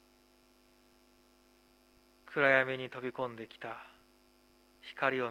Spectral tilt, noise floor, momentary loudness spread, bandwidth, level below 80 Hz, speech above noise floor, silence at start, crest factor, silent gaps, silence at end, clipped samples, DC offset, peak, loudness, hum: -5.5 dB/octave; -66 dBFS; 23 LU; 15.5 kHz; -76 dBFS; 33 dB; 2.3 s; 26 dB; none; 0 s; under 0.1%; under 0.1%; -12 dBFS; -33 LUFS; 50 Hz at -75 dBFS